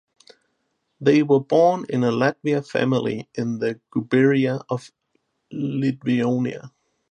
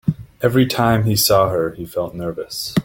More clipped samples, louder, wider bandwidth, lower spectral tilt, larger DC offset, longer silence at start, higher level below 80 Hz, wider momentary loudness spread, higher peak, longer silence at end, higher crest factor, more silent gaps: neither; second, -21 LUFS vs -18 LUFS; second, 9.4 kHz vs 17 kHz; first, -7.5 dB/octave vs -5 dB/octave; neither; first, 1 s vs 0.05 s; second, -68 dBFS vs -44 dBFS; about the same, 11 LU vs 11 LU; about the same, -4 dBFS vs -2 dBFS; first, 0.45 s vs 0 s; about the same, 18 dB vs 16 dB; neither